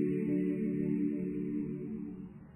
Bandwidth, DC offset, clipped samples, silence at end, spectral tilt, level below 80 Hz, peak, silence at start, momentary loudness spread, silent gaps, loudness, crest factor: 3 kHz; under 0.1%; under 0.1%; 0 s; -11 dB/octave; -64 dBFS; -22 dBFS; 0 s; 10 LU; none; -35 LUFS; 12 dB